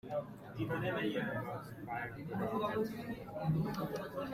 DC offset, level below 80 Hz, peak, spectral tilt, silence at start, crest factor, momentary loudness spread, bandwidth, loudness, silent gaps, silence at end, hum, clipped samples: under 0.1%; -64 dBFS; -24 dBFS; -7.5 dB/octave; 0.05 s; 14 dB; 8 LU; 16 kHz; -39 LUFS; none; 0 s; none; under 0.1%